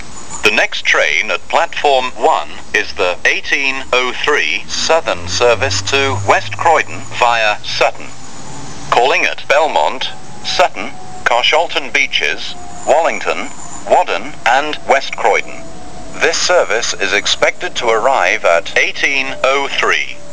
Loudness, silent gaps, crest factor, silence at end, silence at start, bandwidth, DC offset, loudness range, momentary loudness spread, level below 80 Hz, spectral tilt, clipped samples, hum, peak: -13 LUFS; none; 16 dB; 0 s; 0 s; 8 kHz; 8%; 2 LU; 11 LU; -44 dBFS; -2 dB/octave; under 0.1%; none; 0 dBFS